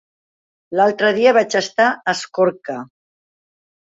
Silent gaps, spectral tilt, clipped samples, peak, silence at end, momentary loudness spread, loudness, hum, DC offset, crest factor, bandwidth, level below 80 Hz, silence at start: none; -3.5 dB/octave; under 0.1%; -2 dBFS; 1.05 s; 14 LU; -16 LUFS; none; under 0.1%; 18 dB; 8 kHz; -66 dBFS; 0.7 s